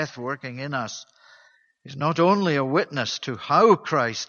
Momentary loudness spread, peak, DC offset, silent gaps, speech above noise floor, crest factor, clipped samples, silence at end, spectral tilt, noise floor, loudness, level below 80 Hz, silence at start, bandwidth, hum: 13 LU; -4 dBFS; under 0.1%; none; 35 dB; 20 dB; under 0.1%; 0.05 s; -5 dB/octave; -58 dBFS; -22 LUFS; -68 dBFS; 0 s; 7.2 kHz; none